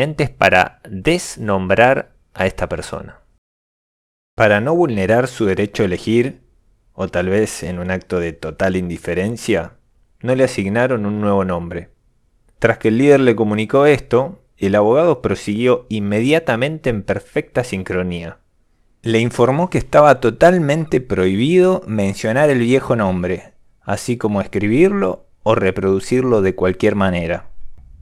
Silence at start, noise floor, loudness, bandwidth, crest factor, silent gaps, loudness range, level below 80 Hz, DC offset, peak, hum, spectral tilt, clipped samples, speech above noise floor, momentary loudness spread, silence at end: 0 s; -58 dBFS; -16 LUFS; 14 kHz; 16 dB; 3.38-4.37 s; 6 LU; -42 dBFS; under 0.1%; 0 dBFS; none; -6.5 dB/octave; under 0.1%; 42 dB; 11 LU; 0.3 s